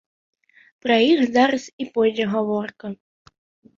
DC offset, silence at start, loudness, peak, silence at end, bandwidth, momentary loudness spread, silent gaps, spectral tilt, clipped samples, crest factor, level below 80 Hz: under 0.1%; 0.85 s; -20 LUFS; -4 dBFS; 0.85 s; 7.6 kHz; 18 LU; 1.73-1.78 s; -5 dB/octave; under 0.1%; 18 dB; -66 dBFS